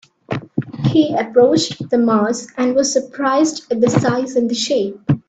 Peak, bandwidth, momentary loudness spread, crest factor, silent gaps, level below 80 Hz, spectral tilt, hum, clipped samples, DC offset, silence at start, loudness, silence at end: 0 dBFS; 9 kHz; 7 LU; 16 dB; none; -52 dBFS; -5.5 dB/octave; none; under 0.1%; under 0.1%; 0.3 s; -17 LUFS; 0.1 s